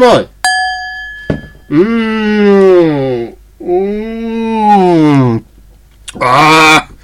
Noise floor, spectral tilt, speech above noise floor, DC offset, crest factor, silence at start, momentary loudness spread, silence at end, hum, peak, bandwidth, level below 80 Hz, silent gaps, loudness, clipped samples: -40 dBFS; -5.5 dB/octave; 32 dB; 0.2%; 10 dB; 0 s; 15 LU; 0.15 s; none; 0 dBFS; 16 kHz; -38 dBFS; none; -9 LUFS; 0.3%